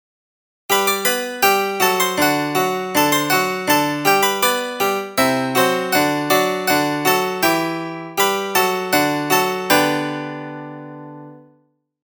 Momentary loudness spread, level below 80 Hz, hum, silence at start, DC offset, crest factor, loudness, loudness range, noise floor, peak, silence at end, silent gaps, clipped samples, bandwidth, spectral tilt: 10 LU; -68 dBFS; none; 0.7 s; under 0.1%; 18 dB; -17 LUFS; 2 LU; -61 dBFS; 0 dBFS; 0.65 s; none; under 0.1%; over 20 kHz; -3 dB/octave